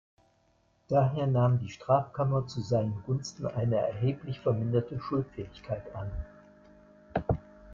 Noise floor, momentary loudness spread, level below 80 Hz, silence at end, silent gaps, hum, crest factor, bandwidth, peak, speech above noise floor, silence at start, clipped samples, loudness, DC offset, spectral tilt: -69 dBFS; 12 LU; -52 dBFS; 0 s; none; none; 20 dB; 7.4 kHz; -12 dBFS; 39 dB; 0.9 s; under 0.1%; -31 LUFS; under 0.1%; -8 dB/octave